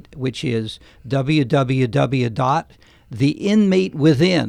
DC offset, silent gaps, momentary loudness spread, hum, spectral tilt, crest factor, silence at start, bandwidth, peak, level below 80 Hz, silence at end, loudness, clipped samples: under 0.1%; none; 10 LU; none; -7 dB/octave; 14 dB; 0.1 s; 10.5 kHz; -4 dBFS; -50 dBFS; 0 s; -19 LUFS; under 0.1%